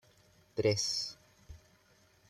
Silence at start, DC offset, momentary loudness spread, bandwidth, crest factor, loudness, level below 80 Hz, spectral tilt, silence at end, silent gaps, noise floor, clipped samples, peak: 0.55 s; under 0.1%; 14 LU; 14 kHz; 20 dB; -33 LUFS; -64 dBFS; -3.5 dB/octave; 0.75 s; none; -67 dBFS; under 0.1%; -18 dBFS